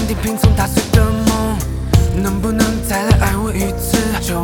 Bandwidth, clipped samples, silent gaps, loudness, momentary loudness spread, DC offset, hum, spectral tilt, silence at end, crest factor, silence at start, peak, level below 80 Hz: 19.5 kHz; under 0.1%; none; -16 LUFS; 5 LU; under 0.1%; none; -5.5 dB/octave; 0 s; 14 dB; 0 s; 0 dBFS; -20 dBFS